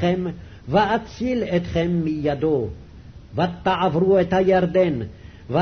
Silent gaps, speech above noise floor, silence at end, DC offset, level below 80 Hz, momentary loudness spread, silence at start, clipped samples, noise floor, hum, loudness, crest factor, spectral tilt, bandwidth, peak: none; 21 dB; 0 s; under 0.1%; -44 dBFS; 13 LU; 0 s; under 0.1%; -42 dBFS; none; -21 LUFS; 16 dB; -8 dB/octave; 6.4 kHz; -6 dBFS